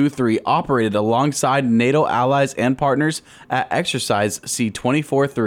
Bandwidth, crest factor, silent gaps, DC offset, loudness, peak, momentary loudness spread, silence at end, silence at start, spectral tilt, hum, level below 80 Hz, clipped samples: 16.5 kHz; 12 dB; none; under 0.1%; -19 LUFS; -6 dBFS; 5 LU; 0 s; 0 s; -5 dB/octave; none; -54 dBFS; under 0.1%